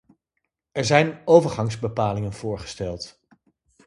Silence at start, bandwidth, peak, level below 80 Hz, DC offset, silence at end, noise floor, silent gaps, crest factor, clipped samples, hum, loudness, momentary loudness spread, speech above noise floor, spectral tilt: 0.75 s; 11.5 kHz; 0 dBFS; -50 dBFS; under 0.1%; 0.75 s; -79 dBFS; none; 24 dB; under 0.1%; none; -22 LUFS; 15 LU; 58 dB; -5.5 dB/octave